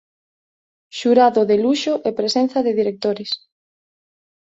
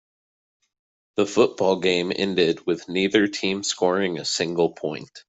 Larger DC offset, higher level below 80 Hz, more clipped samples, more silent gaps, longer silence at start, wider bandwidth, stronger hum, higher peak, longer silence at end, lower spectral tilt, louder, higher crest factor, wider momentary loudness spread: neither; about the same, -64 dBFS vs -64 dBFS; neither; neither; second, 0.95 s vs 1.15 s; about the same, 8 kHz vs 8.4 kHz; neither; about the same, -2 dBFS vs -4 dBFS; first, 1.05 s vs 0.1 s; about the same, -4.5 dB/octave vs -4 dB/octave; first, -18 LUFS vs -23 LUFS; about the same, 18 dB vs 18 dB; first, 12 LU vs 6 LU